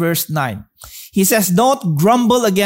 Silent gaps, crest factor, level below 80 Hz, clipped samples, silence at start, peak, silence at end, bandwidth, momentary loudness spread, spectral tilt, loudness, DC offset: none; 14 dB; -52 dBFS; under 0.1%; 0 s; -2 dBFS; 0 s; 16.5 kHz; 17 LU; -4.5 dB/octave; -15 LUFS; under 0.1%